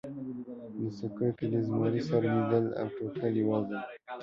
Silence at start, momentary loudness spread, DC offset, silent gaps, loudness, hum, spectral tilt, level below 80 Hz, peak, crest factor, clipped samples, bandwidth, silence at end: 0.05 s; 12 LU; under 0.1%; none; -32 LUFS; none; -9 dB/octave; -68 dBFS; -14 dBFS; 18 dB; under 0.1%; 7.4 kHz; 0 s